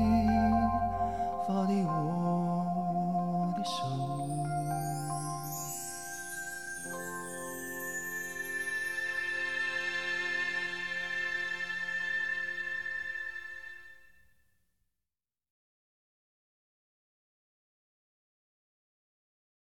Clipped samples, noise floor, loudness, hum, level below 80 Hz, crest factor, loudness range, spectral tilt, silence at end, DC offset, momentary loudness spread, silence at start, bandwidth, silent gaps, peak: under 0.1%; under -90 dBFS; -33 LUFS; none; -54 dBFS; 18 dB; 7 LU; -5 dB/octave; 4.2 s; 0.2%; 9 LU; 0 s; 16.5 kHz; none; -16 dBFS